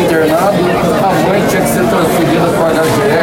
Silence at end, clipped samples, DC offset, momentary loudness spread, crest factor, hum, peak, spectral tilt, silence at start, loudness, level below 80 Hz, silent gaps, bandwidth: 0 s; under 0.1%; under 0.1%; 1 LU; 8 dB; none; -2 dBFS; -5.5 dB/octave; 0 s; -11 LUFS; -36 dBFS; none; 16.5 kHz